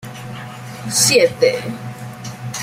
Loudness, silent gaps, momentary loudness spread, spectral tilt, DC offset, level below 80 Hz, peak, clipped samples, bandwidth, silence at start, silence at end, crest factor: -15 LUFS; none; 19 LU; -2.5 dB/octave; under 0.1%; -56 dBFS; 0 dBFS; under 0.1%; 16 kHz; 0 s; 0 s; 20 dB